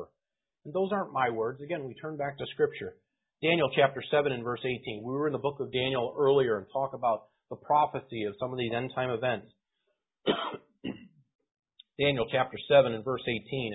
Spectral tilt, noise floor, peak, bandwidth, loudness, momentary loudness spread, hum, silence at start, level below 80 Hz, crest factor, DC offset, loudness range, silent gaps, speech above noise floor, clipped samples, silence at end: -9.5 dB/octave; -90 dBFS; -8 dBFS; 4 kHz; -30 LUFS; 13 LU; none; 0 s; -64 dBFS; 22 dB; under 0.1%; 5 LU; 11.35-11.39 s; 60 dB; under 0.1%; 0 s